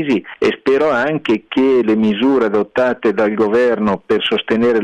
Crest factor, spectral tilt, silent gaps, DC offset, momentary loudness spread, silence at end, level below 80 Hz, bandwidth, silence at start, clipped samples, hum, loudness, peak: 8 dB; -6.5 dB/octave; none; under 0.1%; 4 LU; 0 s; -54 dBFS; 9 kHz; 0 s; under 0.1%; none; -15 LUFS; -6 dBFS